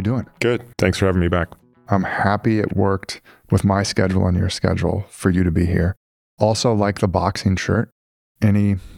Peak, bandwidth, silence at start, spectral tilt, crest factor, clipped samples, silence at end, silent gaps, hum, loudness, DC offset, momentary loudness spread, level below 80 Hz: -2 dBFS; 13 kHz; 0 s; -6.5 dB/octave; 18 dB; under 0.1%; 0 s; 5.97-6.37 s, 7.92-8.35 s; none; -20 LUFS; under 0.1%; 6 LU; -38 dBFS